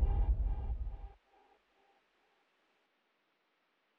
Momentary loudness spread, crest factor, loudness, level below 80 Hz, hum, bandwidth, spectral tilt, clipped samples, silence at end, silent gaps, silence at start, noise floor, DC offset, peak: 18 LU; 18 dB; -39 LUFS; -40 dBFS; none; 3.3 kHz; -9 dB/octave; under 0.1%; 2.9 s; none; 0 s; -78 dBFS; under 0.1%; -20 dBFS